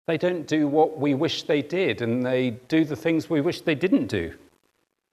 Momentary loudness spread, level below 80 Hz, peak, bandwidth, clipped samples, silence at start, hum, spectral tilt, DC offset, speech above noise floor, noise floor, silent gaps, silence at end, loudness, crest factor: 4 LU; -62 dBFS; -8 dBFS; 13.5 kHz; under 0.1%; 0.1 s; none; -6.5 dB/octave; under 0.1%; 48 dB; -72 dBFS; none; 0.75 s; -24 LUFS; 16 dB